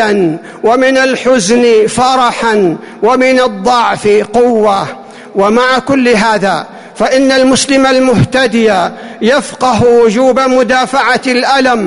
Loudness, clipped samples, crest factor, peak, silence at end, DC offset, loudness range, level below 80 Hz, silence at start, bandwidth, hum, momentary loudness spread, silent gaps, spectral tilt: -9 LUFS; under 0.1%; 8 dB; 0 dBFS; 0 s; 0.4%; 1 LU; -42 dBFS; 0 s; 11 kHz; none; 7 LU; none; -4.5 dB/octave